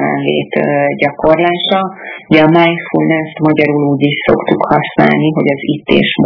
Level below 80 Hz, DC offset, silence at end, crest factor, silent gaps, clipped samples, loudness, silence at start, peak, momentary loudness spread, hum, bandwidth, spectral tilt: -44 dBFS; under 0.1%; 0 s; 12 dB; none; 0.7%; -11 LUFS; 0 s; 0 dBFS; 4 LU; none; 5.4 kHz; -8.5 dB/octave